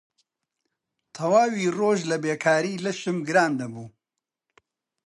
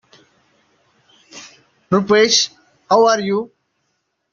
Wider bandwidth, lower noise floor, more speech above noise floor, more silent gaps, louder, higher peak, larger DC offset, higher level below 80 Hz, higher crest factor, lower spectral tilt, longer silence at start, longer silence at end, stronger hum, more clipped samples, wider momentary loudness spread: first, 11.5 kHz vs 7.4 kHz; first, -86 dBFS vs -70 dBFS; first, 63 dB vs 56 dB; neither; second, -24 LUFS vs -15 LUFS; second, -6 dBFS vs -2 dBFS; neither; second, -74 dBFS vs -62 dBFS; about the same, 20 dB vs 18 dB; first, -5 dB/octave vs -2.5 dB/octave; second, 1.15 s vs 1.35 s; first, 1.2 s vs 0.85 s; neither; neither; second, 10 LU vs 25 LU